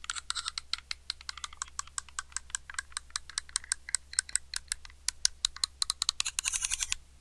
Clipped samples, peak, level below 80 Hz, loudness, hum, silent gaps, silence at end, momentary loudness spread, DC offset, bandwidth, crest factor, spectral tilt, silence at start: under 0.1%; 0 dBFS; -54 dBFS; -33 LUFS; none; none; 0.05 s; 9 LU; under 0.1%; 13.5 kHz; 36 dB; 3 dB/octave; 0 s